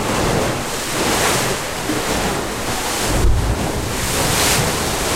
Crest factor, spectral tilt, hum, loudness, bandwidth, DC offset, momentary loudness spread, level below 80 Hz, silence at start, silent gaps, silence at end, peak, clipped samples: 16 dB; -3 dB/octave; none; -18 LUFS; 16 kHz; under 0.1%; 6 LU; -26 dBFS; 0 s; none; 0 s; -2 dBFS; under 0.1%